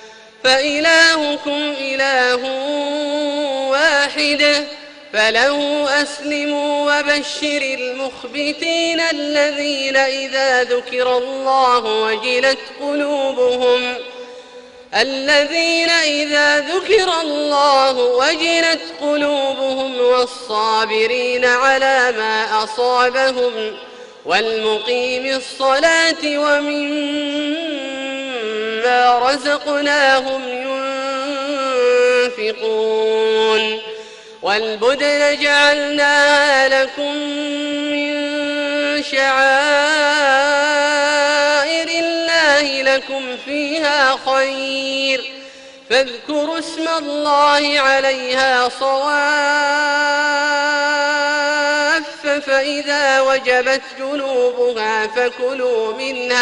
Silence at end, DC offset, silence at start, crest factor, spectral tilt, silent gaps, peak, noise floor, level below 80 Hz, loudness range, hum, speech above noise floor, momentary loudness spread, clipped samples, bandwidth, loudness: 0 s; under 0.1%; 0 s; 16 dB; -1 dB/octave; none; 0 dBFS; -39 dBFS; -60 dBFS; 4 LU; none; 23 dB; 8 LU; under 0.1%; 11 kHz; -16 LUFS